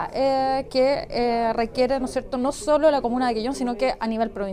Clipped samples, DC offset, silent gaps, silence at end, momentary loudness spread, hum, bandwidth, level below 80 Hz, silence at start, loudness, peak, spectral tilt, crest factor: under 0.1%; under 0.1%; none; 0 s; 6 LU; none; 14.5 kHz; -44 dBFS; 0 s; -23 LUFS; -8 dBFS; -4.5 dB/octave; 14 dB